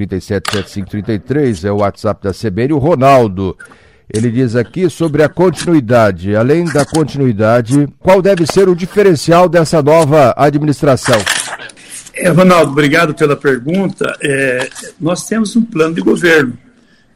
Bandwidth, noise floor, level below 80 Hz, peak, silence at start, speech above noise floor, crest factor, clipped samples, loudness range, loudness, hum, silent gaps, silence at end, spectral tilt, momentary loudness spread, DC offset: 16 kHz; -47 dBFS; -42 dBFS; 0 dBFS; 0 s; 36 dB; 12 dB; under 0.1%; 4 LU; -11 LUFS; none; none; 0.6 s; -6 dB/octave; 10 LU; under 0.1%